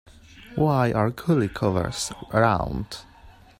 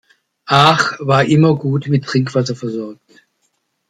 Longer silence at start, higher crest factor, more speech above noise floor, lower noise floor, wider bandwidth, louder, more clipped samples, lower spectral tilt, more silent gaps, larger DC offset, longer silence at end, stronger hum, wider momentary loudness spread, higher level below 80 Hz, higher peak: about the same, 0.35 s vs 0.45 s; about the same, 18 dB vs 16 dB; second, 26 dB vs 52 dB; second, -50 dBFS vs -67 dBFS; first, 16 kHz vs 11 kHz; second, -24 LUFS vs -14 LUFS; neither; about the same, -6 dB/octave vs -6 dB/octave; neither; neither; second, 0.3 s vs 0.95 s; neither; about the same, 13 LU vs 13 LU; first, -44 dBFS vs -54 dBFS; second, -6 dBFS vs 0 dBFS